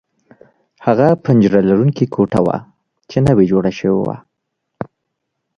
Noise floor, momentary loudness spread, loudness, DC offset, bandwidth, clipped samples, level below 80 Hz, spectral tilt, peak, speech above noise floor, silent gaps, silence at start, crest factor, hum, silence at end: -74 dBFS; 19 LU; -15 LUFS; under 0.1%; 10 kHz; under 0.1%; -46 dBFS; -9 dB/octave; 0 dBFS; 61 dB; none; 0.8 s; 16 dB; none; 0.75 s